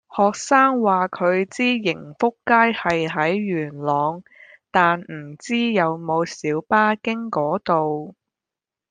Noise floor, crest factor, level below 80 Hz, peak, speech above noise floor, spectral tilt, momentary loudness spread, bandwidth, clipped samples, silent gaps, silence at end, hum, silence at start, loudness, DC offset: -88 dBFS; 18 dB; -64 dBFS; -2 dBFS; 68 dB; -5 dB/octave; 9 LU; 9.6 kHz; under 0.1%; none; 0.8 s; none; 0.1 s; -20 LUFS; under 0.1%